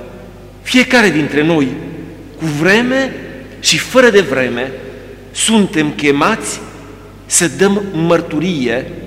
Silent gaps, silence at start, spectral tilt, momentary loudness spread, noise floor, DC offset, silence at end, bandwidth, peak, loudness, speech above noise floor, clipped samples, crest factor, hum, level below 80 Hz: none; 0 s; -3.5 dB/octave; 20 LU; -34 dBFS; under 0.1%; 0 s; 16 kHz; 0 dBFS; -13 LUFS; 21 dB; under 0.1%; 14 dB; none; -42 dBFS